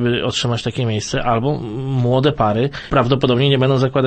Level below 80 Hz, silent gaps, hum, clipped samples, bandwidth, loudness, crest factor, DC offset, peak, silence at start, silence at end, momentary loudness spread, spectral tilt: -40 dBFS; none; none; under 0.1%; 8.8 kHz; -17 LUFS; 16 dB; under 0.1%; 0 dBFS; 0 s; 0 s; 6 LU; -6 dB/octave